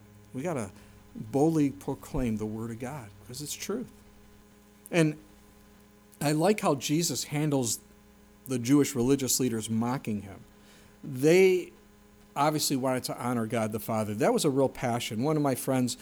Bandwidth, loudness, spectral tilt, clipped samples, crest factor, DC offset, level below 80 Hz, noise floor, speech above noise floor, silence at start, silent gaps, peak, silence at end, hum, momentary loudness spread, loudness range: over 20 kHz; -28 LUFS; -5 dB/octave; under 0.1%; 18 dB; under 0.1%; -54 dBFS; -56 dBFS; 28 dB; 0.15 s; none; -10 dBFS; 0 s; 60 Hz at -60 dBFS; 15 LU; 7 LU